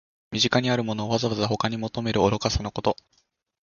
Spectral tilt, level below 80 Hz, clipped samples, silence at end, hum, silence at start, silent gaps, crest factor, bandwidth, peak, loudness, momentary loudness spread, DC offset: -5 dB/octave; -42 dBFS; under 0.1%; 0.7 s; none; 0.3 s; none; 22 dB; 7.2 kHz; -4 dBFS; -25 LUFS; 7 LU; under 0.1%